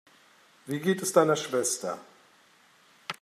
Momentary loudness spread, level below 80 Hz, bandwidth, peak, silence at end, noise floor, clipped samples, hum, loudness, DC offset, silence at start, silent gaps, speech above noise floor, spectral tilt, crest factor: 17 LU; -80 dBFS; 15.5 kHz; -8 dBFS; 0.1 s; -61 dBFS; under 0.1%; none; -27 LUFS; under 0.1%; 0.65 s; none; 34 dB; -4 dB/octave; 22 dB